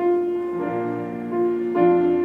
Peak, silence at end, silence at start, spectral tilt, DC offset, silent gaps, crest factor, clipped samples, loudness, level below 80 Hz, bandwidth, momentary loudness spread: -8 dBFS; 0 s; 0 s; -9.5 dB/octave; under 0.1%; none; 14 dB; under 0.1%; -22 LUFS; -66 dBFS; 3.8 kHz; 9 LU